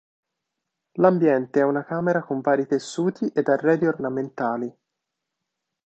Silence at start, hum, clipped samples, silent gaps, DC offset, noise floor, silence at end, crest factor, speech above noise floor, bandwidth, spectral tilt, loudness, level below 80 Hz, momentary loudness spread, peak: 0.95 s; none; under 0.1%; none; under 0.1%; -82 dBFS; 1.15 s; 22 dB; 61 dB; 8.8 kHz; -7 dB/octave; -23 LUFS; -70 dBFS; 7 LU; -2 dBFS